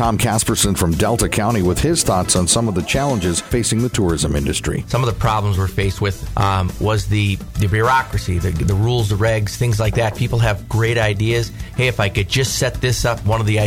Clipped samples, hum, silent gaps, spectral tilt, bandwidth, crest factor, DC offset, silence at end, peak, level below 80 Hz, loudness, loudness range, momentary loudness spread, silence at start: under 0.1%; none; none; -4.5 dB/octave; 18 kHz; 16 dB; under 0.1%; 0 s; 0 dBFS; -30 dBFS; -18 LUFS; 2 LU; 4 LU; 0 s